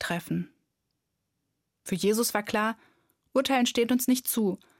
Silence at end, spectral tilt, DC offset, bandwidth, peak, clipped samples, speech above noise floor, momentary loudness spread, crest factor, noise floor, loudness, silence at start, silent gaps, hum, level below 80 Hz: 0.25 s; -4 dB/octave; under 0.1%; 17 kHz; -10 dBFS; under 0.1%; 54 dB; 10 LU; 18 dB; -81 dBFS; -27 LUFS; 0 s; none; none; -68 dBFS